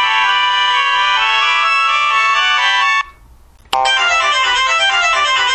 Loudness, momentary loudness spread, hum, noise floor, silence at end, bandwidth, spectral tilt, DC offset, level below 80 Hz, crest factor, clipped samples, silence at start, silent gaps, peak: -12 LUFS; 2 LU; none; -43 dBFS; 0 s; 12.5 kHz; 2 dB/octave; under 0.1%; -48 dBFS; 14 dB; under 0.1%; 0 s; none; 0 dBFS